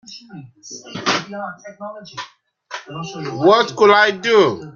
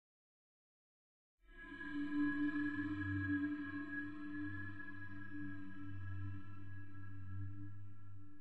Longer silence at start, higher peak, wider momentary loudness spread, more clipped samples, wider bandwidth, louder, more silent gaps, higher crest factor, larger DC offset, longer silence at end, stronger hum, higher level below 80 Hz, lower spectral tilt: second, 0.1 s vs 1.35 s; first, -2 dBFS vs -28 dBFS; first, 22 LU vs 15 LU; neither; first, 7.4 kHz vs 4.4 kHz; first, -15 LUFS vs -45 LUFS; neither; about the same, 18 dB vs 16 dB; neither; about the same, 0.05 s vs 0 s; neither; first, -64 dBFS vs -70 dBFS; second, -4 dB/octave vs -8.5 dB/octave